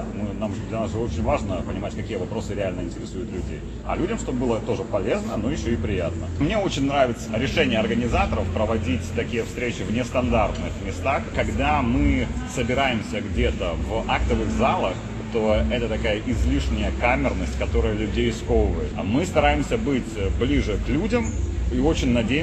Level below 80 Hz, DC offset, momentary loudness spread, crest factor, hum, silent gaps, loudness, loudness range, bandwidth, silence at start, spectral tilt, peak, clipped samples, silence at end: -30 dBFS; under 0.1%; 7 LU; 18 dB; none; none; -24 LUFS; 4 LU; 9 kHz; 0 s; -6 dB/octave; -4 dBFS; under 0.1%; 0 s